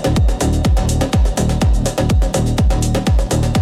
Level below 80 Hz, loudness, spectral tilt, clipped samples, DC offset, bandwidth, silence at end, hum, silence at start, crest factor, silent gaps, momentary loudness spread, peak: -18 dBFS; -16 LUFS; -6 dB/octave; under 0.1%; under 0.1%; 15 kHz; 0 s; none; 0 s; 10 dB; none; 1 LU; -4 dBFS